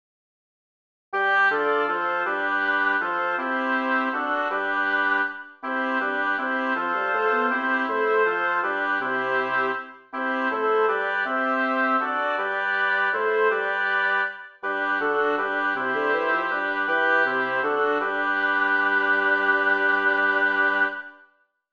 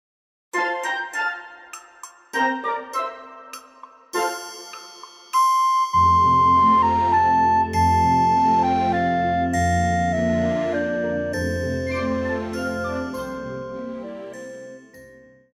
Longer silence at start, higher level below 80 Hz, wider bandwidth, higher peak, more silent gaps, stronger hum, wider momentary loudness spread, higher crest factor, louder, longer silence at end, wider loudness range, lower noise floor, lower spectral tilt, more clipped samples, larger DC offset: first, 1.1 s vs 0.55 s; second, -74 dBFS vs -44 dBFS; second, 7 kHz vs 14 kHz; about the same, -8 dBFS vs -8 dBFS; neither; neither; second, 5 LU vs 21 LU; about the same, 16 dB vs 14 dB; about the same, -23 LUFS vs -21 LUFS; first, 0.6 s vs 0.45 s; second, 3 LU vs 11 LU; first, -61 dBFS vs -48 dBFS; about the same, -4.5 dB/octave vs -5.5 dB/octave; neither; neither